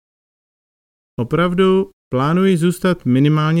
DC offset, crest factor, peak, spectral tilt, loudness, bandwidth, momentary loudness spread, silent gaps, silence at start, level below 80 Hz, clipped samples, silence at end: under 0.1%; 14 dB; -2 dBFS; -7.5 dB/octave; -16 LUFS; 16 kHz; 8 LU; 1.93-2.11 s; 1.2 s; -46 dBFS; under 0.1%; 0 s